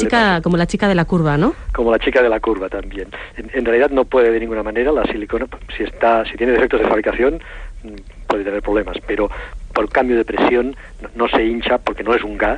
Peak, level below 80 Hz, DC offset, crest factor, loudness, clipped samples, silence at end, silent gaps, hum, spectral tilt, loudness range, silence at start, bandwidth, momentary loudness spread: -4 dBFS; -32 dBFS; under 0.1%; 14 dB; -17 LUFS; under 0.1%; 0 s; none; none; -6.5 dB/octave; 3 LU; 0 s; 10 kHz; 15 LU